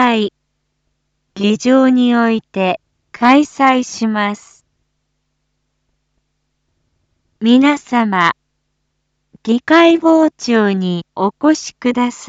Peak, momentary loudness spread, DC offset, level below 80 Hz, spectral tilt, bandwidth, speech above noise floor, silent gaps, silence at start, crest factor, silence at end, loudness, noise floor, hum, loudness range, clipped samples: 0 dBFS; 9 LU; under 0.1%; -62 dBFS; -5 dB/octave; 8 kHz; 56 dB; none; 0 s; 16 dB; 0 s; -14 LUFS; -69 dBFS; none; 6 LU; under 0.1%